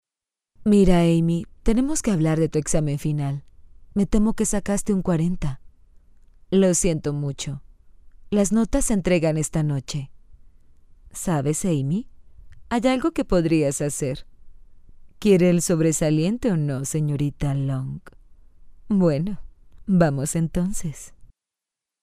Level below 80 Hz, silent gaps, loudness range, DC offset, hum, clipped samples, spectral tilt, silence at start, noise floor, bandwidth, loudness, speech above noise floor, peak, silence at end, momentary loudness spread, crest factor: -36 dBFS; none; 4 LU; under 0.1%; none; under 0.1%; -6 dB/octave; 0.6 s; -89 dBFS; 15.5 kHz; -22 LUFS; 68 dB; -4 dBFS; 0.75 s; 13 LU; 20 dB